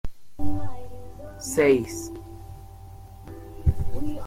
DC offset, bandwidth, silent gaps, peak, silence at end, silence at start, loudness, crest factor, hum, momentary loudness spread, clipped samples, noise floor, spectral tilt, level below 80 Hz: under 0.1%; 16 kHz; none; -8 dBFS; 0 s; 0.05 s; -26 LUFS; 16 dB; none; 24 LU; under 0.1%; -43 dBFS; -6 dB/octave; -36 dBFS